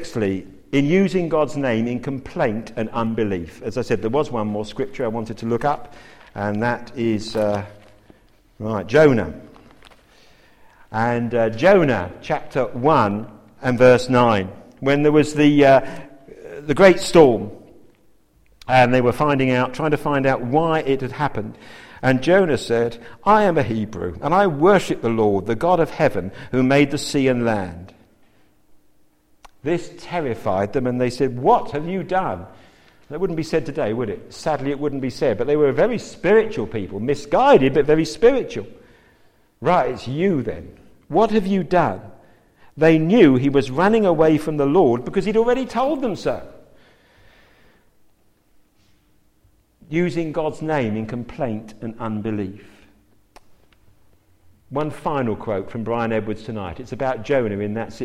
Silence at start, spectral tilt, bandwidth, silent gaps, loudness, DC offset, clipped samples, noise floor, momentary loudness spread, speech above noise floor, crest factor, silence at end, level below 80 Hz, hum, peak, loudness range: 0 s; -6.5 dB/octave; 13.5 kHz; none; -19 LUFS; under 0.1%; under 0.1%; -58 dBFS; 14 LU; 40 dB; 20 dB; 0 s; -46 dBFS; none; 0 dBFS; 10 LU